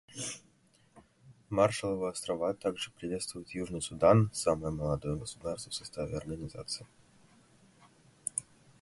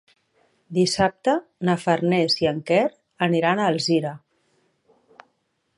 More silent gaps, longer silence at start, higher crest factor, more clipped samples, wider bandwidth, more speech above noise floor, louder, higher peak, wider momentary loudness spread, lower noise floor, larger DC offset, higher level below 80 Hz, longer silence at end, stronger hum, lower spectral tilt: neither; second, 0.1 s vs 0.7 s; first, 24 dB vs 18 dB; neither; about the same, 11.5 kHz vs 11.5 kHz; second, 34 dB vs 50 dB; second, -33 LUFS vs -22 LUFS; second, -10 dBFS vs -4 dBFS; first, 13 LU vs 5 LU; second, -67 dBFS vs -71 dBFS; neither; about the same, -56 dBFS vs -60 dBFS; second, 0.4 s vs 1.6 s; neither; about the same, -5 dB/octave vs -5 dB/octave